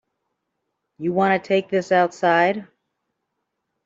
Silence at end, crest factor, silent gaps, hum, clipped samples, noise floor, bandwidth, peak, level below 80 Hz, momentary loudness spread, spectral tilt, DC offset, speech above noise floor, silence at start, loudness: 1.25 s; 18 dB; none; none; under 0.1%; -78 dBFS; 7.8 kHz; -4 dBFS; -70 dBFS; 8 LU; -6 dB/octave; under 0.1%; 58 dB; 1 s; -20 LUFS